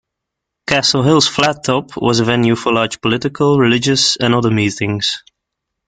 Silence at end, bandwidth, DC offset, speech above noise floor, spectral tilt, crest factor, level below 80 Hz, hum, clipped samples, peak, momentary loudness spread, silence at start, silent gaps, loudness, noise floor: 0.7 s; 9.6 kHz; under 0.1%; 65 dB; -4.5 dB/octave; 16 dB; -48 dBFS; none; under 0.1%; 0 dBFS; 6 LU; 0.7 s; none; -14 LUFS; -79 dBFS